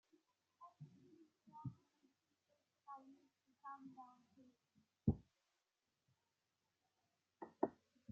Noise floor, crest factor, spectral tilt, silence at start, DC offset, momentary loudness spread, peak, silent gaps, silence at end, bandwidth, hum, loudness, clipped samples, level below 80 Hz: under -90 dBFS; 30 dB; -10 dB/octave; 0.6 s; under 0.1%; 23 LU; -22 dBFS; none; 0 s; 7.2 kHz; none; -49 LUFS; under 0.1%; -70 dBFS